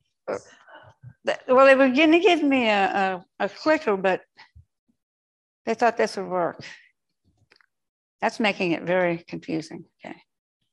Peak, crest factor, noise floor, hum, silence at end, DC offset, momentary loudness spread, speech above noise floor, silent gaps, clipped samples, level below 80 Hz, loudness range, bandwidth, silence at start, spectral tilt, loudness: -4 dBFS; 20 dB; -70 dBFS; none; 0.6 s; under 0.1%; 19 LU; 48 dB; 4.79-4.87 s, 5.03-5.65 s, 7.89-8.19 s; under 0.1%; -70 dBFS; 9 LU; 11 kHz; 0.25 s; -5 dB/octave; -22 LUFS